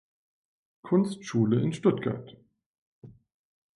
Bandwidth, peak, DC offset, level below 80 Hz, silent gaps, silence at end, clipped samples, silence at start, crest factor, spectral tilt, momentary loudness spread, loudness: 11.5 kHz; -10 dBFS; under 0.1%; -66 dBFS; 2.66-3.02 s; 0.65 s; under 0.1%; 0.85 s; 20 dB; -7.5 dB/octave; 8 LU; -27 LUFS